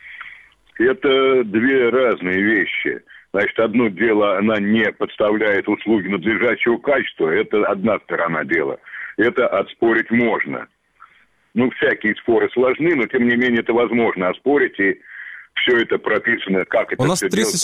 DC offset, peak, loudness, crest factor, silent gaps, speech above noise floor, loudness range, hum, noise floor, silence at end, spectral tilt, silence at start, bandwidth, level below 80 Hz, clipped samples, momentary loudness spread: under 0.1%; -4 dBFS; -18 LUFS; 14 dB; none; 38 dB; 2 LU; none; -56 dBFS; 0 s; -4.5 dB/octave; 0.05 s; 15 kHz; -58 dBFS; under 0.1%; 6 LU